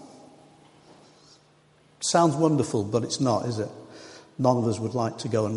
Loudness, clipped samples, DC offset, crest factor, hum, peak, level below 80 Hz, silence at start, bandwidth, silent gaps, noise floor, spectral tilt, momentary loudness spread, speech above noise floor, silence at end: -25 LUFS; under 0.1%; under 0.1%; 20 dB; none; -6 dBFS; -64 dBFS; 0 s; 11.5 kHz; none; -59 dBFS; -5.5 dB/octave; 19 LU; 35 dB; 0 s